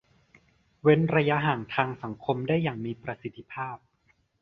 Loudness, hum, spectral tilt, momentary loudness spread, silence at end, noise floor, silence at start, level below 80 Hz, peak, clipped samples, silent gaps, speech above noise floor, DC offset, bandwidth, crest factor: -27 LUFS; none; -9 dB/octave; 15 LU; 0.65 s; -69 dBFS; 0.85 s; -62 dBFS; -6 dBFS; under 0.1%; none; 42 dB; under 0.1%; 5.4 kHz; 22 dB